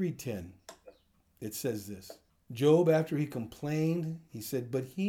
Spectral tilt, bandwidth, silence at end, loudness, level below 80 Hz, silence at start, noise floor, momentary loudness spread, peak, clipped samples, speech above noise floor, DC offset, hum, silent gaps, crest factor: -6.5 dB/octave; over 20 kHz; 0 s; -32 LUFS; -70 dBFS; 0 s; -67 dBFS; 22 LU; -14 dBFS; under 0.1%; 35 dB; under 0.1%; none; none; 18 dB